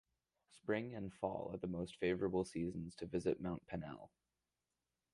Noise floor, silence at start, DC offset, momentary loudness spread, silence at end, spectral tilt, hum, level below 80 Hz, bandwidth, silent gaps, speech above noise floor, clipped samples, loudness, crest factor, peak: under -90 dBFS; 0.5 s; under 0.1%; 9 LU; 1.05 s; -7 dB/octave; none; -66 dBFS; 11.5 kHz; none; over 48 dB; under 0.1%; -43 LUFS; 20 dB; -24 dBFS